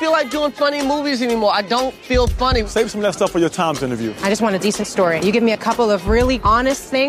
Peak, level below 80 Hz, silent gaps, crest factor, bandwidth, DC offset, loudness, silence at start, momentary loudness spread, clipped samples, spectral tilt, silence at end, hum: -4 dBFS; -30 dBFS; none; 12 dB; 15.5 kHz; under 0.1%; -17 LUFS; 0 s; 4 LU; under 0.1%; -4.5 dB/octave; 0 s; none